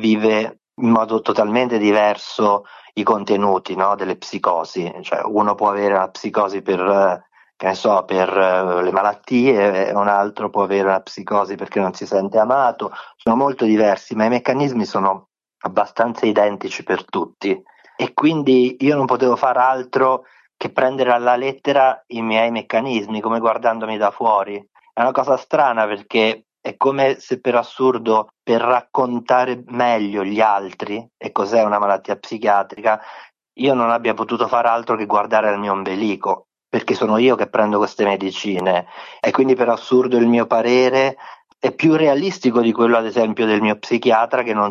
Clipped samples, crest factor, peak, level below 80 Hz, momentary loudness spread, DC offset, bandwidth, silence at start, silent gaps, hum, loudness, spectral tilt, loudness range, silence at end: under 0.1%; 16 dB; -2 dBFS; -64 dBFS; 8 LU; under 0.1%; 7.4 kHz; 0 s; none; none; -18 LUFS; -6 dB/octave; 3 LU; 0 s